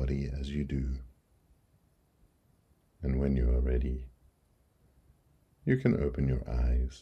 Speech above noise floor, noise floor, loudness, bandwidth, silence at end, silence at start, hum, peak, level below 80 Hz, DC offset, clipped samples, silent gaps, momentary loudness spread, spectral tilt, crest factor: 39 dB; -69 dBFS; -32 LUFS; 6.4 kHz; 0 s; 0 s; none; -12 dBFS; -36 dBFS; under 0.1%; under 0.1%; none; 10 LU; -9 dB/octave; 20 dB